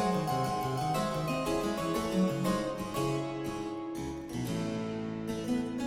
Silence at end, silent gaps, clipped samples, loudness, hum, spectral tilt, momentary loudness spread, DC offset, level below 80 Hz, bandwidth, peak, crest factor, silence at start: 0 s; none; under 0.1%; -33 LUFS; none; -6 dB/octave; 7 LU; under 0.1%; -54 dBFS; 16.5 kHz; -18 dBFS; 14 dB; 0 s